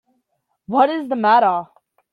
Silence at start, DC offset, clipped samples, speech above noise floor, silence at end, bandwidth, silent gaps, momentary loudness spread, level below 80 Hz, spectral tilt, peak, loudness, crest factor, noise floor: 0.7 s; under 0.1%; under 0.1%; 55 dB; 0.5 s; 5.2 kHz; none; 8 LU; -72 dBFS; -7 dB/octave; -2 dBFS; -17 LUFS; 18 dB; -71 dBFS